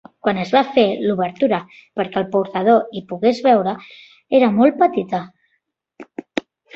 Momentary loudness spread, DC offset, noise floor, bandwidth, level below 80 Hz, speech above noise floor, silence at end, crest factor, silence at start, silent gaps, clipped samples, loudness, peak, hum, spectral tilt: 14 LU; under 0.1%; -70 dBFS; 7.6 kHz; -62 dBFS; 53 dB; 0.35 s; 16 dB; 0.25 s; none; under 0.1%; -18 LUFS; -2 dBFS; none; -7 dB/octave